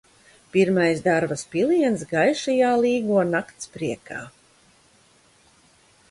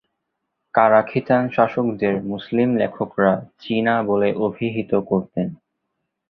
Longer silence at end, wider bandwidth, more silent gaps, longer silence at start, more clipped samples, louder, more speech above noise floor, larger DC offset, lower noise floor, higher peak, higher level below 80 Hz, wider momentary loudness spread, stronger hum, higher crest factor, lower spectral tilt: first, 1.8 s vs 0.75 s; first, 11.5 kHz vs 5.6 kHz; neither; second, 0.55 s vs 0.75 s; neither; about the same, -22 LUFS vs -20 LUFS; second, 36 dB vs 58 dB; neither; second, -57 dBFS vs -77 dBFS; second, -6 dBFS vs -2 dBFS; about the same, -62 dBFS vs -58 dBFS; about the same, 11 LU vs 9 LU; neither; about the same, 16 dB vs 18 dB; second, -5.5 dB/octave vs -9.5 dB/octave